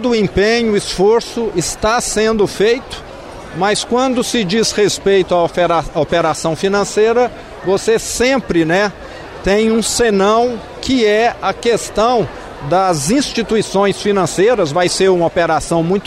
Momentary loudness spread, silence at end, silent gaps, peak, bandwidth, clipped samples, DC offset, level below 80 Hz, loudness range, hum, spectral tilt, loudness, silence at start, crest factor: 6 LU; 0 s; none; -4 dBFS; 14.5 kHz; under 0.1%; under 0.1%; -38 dBFS; 1 LU; none; -4 dB/octave; -14 LUFS; 0 s; 12 dB